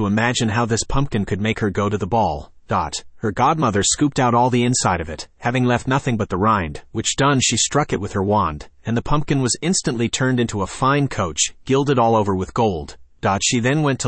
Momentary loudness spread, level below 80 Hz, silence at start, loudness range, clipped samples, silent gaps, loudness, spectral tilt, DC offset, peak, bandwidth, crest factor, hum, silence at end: 8 LU; -40 dBFS; 0 s; 2 LU; under 0.1%; none; -19 LUFS; -4.5 dB/octave; under 0.1%; -4 dBFS; 8.8 kHz; 16 dB; none; 0 s